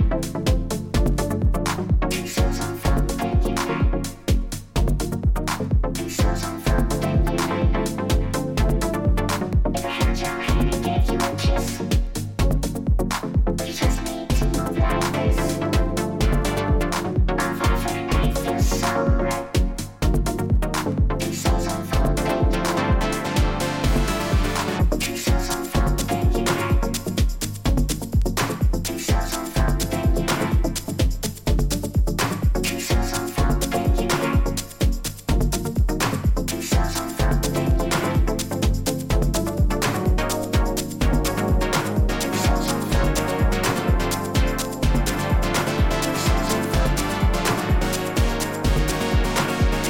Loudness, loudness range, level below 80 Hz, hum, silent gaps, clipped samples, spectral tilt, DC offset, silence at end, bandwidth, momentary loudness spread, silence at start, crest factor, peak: -23 LUFS; 1 LU; -24 dBFS; none; none; under 0.1%; -5 dB/octave; under 0.1%; 0 s; 17 kHz; 3 LU; 0 s; 14 dB; -6 dBFS